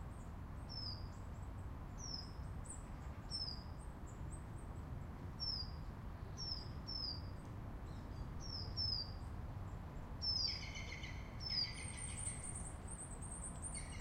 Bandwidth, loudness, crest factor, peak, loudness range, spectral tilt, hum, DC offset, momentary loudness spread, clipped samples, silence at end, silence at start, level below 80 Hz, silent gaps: 16 kHz; -46 LUFS; 18 dB; -28 dBFS; 6 LU; -3.5 dB/octave; none; under 0.1%; 12 LU; under 0.1%; 0 s; 0 s; -52 dBFS; none